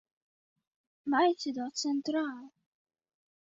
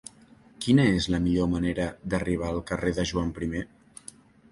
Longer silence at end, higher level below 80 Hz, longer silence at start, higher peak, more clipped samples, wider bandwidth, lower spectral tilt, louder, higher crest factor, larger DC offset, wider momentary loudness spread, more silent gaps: first, 1.1 s vs 0.85 s; second, -82 dBFS vs -42 dBFS; first, 1.05 s vs 0.6 s; second, -16 dBFS vs -8 dBFS; neither; second, 7.8 kHz vs 11.5 kHz; second, -2.5 dB/octave vs -6 dB/octave; second, -31 LUFS vs -27 LUFS; about the same, 18 dB vs 20 dB; neither; second, 13 LU vs 23 LU; neither